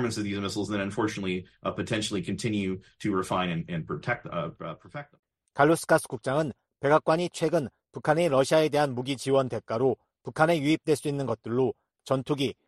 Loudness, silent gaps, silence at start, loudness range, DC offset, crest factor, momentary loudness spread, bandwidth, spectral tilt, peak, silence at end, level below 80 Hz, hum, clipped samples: -28 LUFS; 5.19-5.23 s; 0 s; 5 LU; under 0.1%; 22 dB; 11 LU; 12.5 kHz; -5.5 dB/octave; -6 dBFS; 0.15 s; -62 dBFS; none; under 0.1%